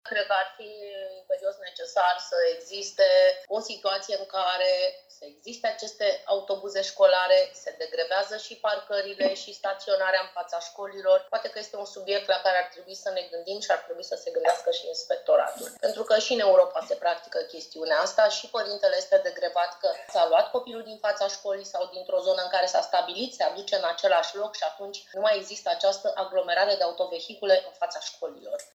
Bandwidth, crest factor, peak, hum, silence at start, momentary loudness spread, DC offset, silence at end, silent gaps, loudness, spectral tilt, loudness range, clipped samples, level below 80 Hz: 13.5 kHz; 20 dB; -6 dBFS; none; 0.05 s; 12 LU; under 0.1%; 0.1 s; none; -26 LUFS; -0.5 dB/octave; 3 LU; under 0.1%; -82 dBFS